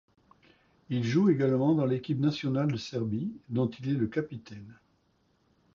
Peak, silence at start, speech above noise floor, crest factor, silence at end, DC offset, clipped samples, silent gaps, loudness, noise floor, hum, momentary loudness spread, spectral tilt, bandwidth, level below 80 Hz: -14 dBFS; 0.9 s; 42 dB; 16 dB; 1 s; under 0.1%; under 0.1%; none; -29 LUFS; -70 dBFS; none; 11 LU; -8 dB/octave; 7.2 kHz; -64 dBFS